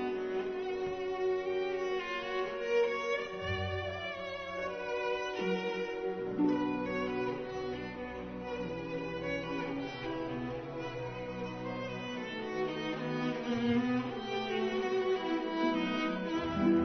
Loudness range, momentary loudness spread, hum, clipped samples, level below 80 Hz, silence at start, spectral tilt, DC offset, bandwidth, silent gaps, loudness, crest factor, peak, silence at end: 5 LU; 8 LU; none; under 0.1%; -60 dBFS; 0 s; -4 dB/octave; under 0.1%; 6.4 kHz; none; -35 LUFS; 18 dB; -18 dBFS; 0 s